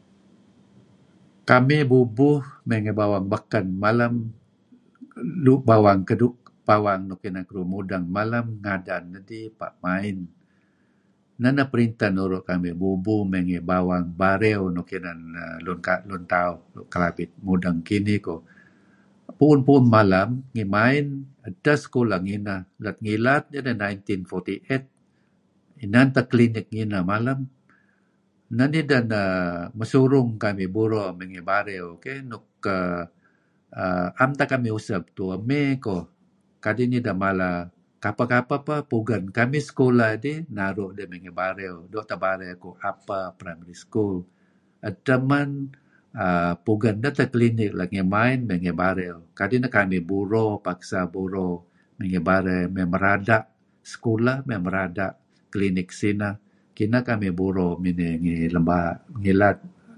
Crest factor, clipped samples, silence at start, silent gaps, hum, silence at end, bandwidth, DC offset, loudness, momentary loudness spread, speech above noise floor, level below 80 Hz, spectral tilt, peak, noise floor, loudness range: 22 dB; under 0.1%; 1.45 s; none; none; 0.3 s; 11 kHz; under 0.1%; -23 LUFS; 14 LU; 42 dB; -50 dBFS; -8 dB/octave; 0 dBFS; -65 dBFS; 6 LU